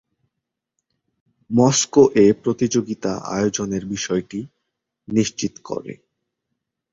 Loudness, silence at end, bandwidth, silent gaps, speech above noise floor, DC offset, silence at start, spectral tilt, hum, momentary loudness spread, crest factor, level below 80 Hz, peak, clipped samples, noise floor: -19 LUFS; 1 s; 7.8 kHz; none; 63 dB; under 0.1%; 1.5 s; -5 dB/octave; none; 16 LU; 20 dB; -56 dBFS; -2 dBFS; under 0.1%; -82 dBFS